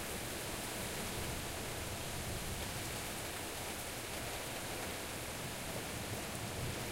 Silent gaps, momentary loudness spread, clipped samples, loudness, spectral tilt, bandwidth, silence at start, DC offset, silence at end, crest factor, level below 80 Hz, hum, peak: none; 1 LU; under 0.1%; -41 LUFS; -3 dB/octave; 16 kHz; 0 s; under 0.1%; 0 s; 16 dB; -54 dBFS; none; -26 dBFS